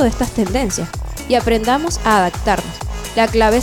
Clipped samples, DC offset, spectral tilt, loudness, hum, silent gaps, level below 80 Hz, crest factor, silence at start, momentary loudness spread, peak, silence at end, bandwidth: under 0.1%; under 0.1%; -4.5 dB/octave; -17 LUFS; none; none; -28 dBFS; 16 dB; 0 s; 11 LU; 0 dBFS; 0 s; over 20 kHz